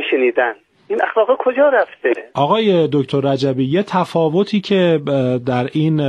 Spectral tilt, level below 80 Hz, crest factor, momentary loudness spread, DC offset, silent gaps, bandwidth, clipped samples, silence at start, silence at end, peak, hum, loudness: -7.5 dB/octave; -60 dBFS; 14 dB; 5 LU; under 0.1%; none; 10.5 kHz; under 0.1%; 0 s; 0 s; -2 dBFS; none; -16 LUFS